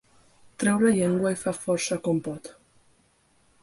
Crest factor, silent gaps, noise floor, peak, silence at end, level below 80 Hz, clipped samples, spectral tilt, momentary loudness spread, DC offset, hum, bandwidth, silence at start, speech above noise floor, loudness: 16 dB; none; -64 dBFS; -10 dBFS; 1.1 s; -62 dBFS; under 0.1%; -5.5 dB/octave; 14 LU; under 0.1%; none; 11.5 kHz; 0.6 s; 40 dB; -25 LUFS